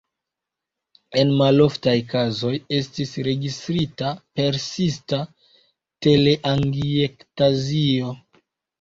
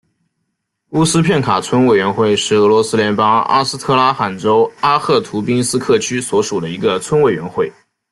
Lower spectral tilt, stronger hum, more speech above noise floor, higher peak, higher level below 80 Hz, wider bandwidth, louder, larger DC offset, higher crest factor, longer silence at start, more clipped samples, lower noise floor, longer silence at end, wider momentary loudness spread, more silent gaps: first, -6.5 dB/octave vs -4.5 dB/octave; neither; first, 65 dB vs 58 dB; second, -4 dBFS vs 0 dBFS; about the same, -52 dBFS vs -52 dBFS; second, 7.6 kHz vs 12.5 kHz; second, -21 LUFS vs -14 LUFS; neither; about the same, 18 dB vs 14 dB; first, 1.1 s vs 0.9 s; neither; first, -85 dBFS vs -71 dBFS; first, 0.65 s vs 0.4 s; first, 10 LU vs 6 LU; neither